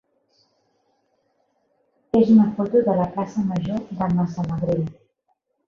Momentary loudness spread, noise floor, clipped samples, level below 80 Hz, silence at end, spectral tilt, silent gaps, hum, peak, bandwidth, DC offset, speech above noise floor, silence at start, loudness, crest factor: 10 LU; -71 dBFS; under 0.1%; -54 dBFS; 0.75 s; -9.5 dB/octave; none; none; -6 dBFS; 6.8 kHz; under 0.1%; 52 dB; 2.15 s; -21 LUFS; 18 dB